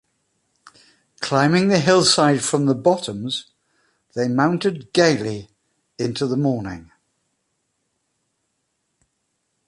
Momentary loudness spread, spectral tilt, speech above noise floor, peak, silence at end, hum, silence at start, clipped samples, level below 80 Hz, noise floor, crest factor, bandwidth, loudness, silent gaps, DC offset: 14 LU; -4.5 dB/octave; 54 dB; -2 dBFS; 2.85 s; none; 1.2 s; under 0.1%; -58 dBFS; -73 dBFS; 20 dB; 11.5 kHz; -19 LUFS; none; under 0.1%